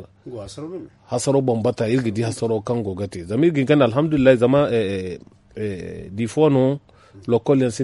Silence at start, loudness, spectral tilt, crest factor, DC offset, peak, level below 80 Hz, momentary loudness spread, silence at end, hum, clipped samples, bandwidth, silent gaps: 0 s; -20 LUFS; -6.5 dB/octave; 18 dB; under 0.1%; -2 dBFS; -52 dBFS; 17 LU; 0 s; none; under 0.1%; 11.5 kHz; none